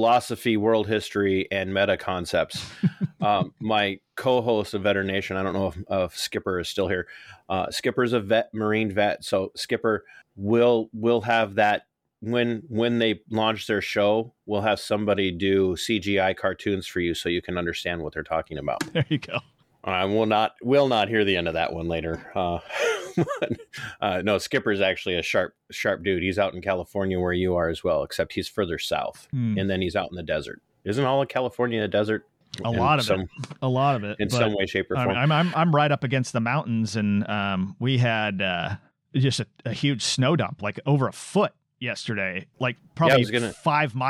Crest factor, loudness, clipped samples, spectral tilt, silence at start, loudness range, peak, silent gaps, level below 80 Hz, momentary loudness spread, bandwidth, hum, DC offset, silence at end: 18 dB; -25 LUFS; under 0.1%; -5.5 dB/octave; 0 s; 3 LU; -6 dBFS; none; -54 dBFS; 8 LU; 15.5 kHz; none; under 0.1%; 0 s